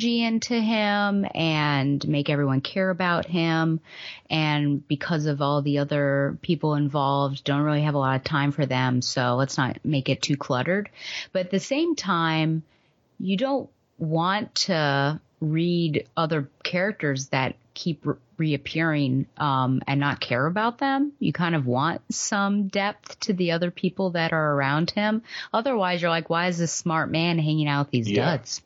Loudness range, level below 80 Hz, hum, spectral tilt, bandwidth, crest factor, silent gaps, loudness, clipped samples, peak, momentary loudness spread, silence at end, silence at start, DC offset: 2 LU; -64 dBFS; none; -5.5 dB/octave; 8 kHz; 18 dB; none; -24 LUFS; under 0.1%; -8 dBFS; 5 LU; 0.1 s; 0 s; under 0.1%